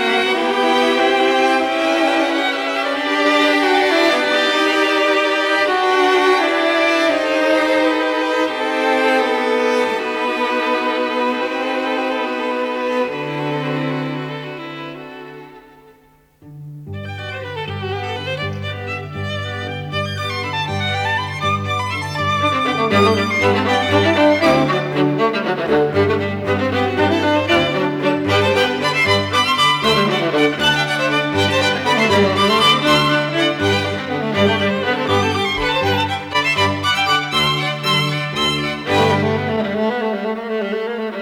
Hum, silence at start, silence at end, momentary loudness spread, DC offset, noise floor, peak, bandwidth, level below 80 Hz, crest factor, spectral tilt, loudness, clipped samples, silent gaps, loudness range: none; 0 s; 0 s; 10 LU; under 0.1%; -52 dBFS; -2 dBFS; 17.5 kHz; -52 dBFS; 14 dB; -4.5 dB/octave; -16 LUFS; under 0.1%; none; 10 LU